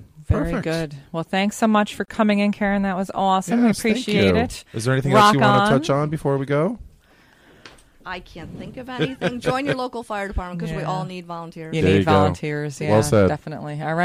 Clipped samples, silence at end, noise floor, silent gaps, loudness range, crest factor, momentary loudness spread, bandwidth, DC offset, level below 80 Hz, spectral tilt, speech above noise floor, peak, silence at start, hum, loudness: under 0.1%; 0 s; -54 dBFS; none; 9 LU; 16 dB; 16 LU; 15.5 kHz; under 0.1%; -42 dBFS; -6 dB/octave; 33 dB; -4 dBFS; 0 s; none; -20 LUFS